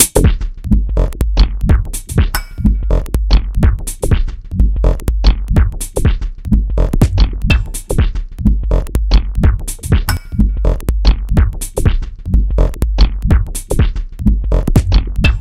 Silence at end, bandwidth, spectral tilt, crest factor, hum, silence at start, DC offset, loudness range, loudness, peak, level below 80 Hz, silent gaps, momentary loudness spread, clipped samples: 0 s; 15.5 kHz; -5.5 dB/octave; 12 dB; none; 0 s; under 0.1%; 1 LU; -16 LUFS; 0 dBFS; -14 dBFS; none; 5 LU; 0.2%